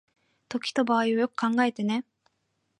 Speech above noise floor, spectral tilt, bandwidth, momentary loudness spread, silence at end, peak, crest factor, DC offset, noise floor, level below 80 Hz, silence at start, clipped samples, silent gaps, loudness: 50 dB; -5 dB/octave; 11 kHz; 9 LU; 0.8 s; -10 dBFS; 18 dB; under 0.1%; -76 dBFS; -78 dBFS; 0.5 s; under 0.1%; none; -27 LUFS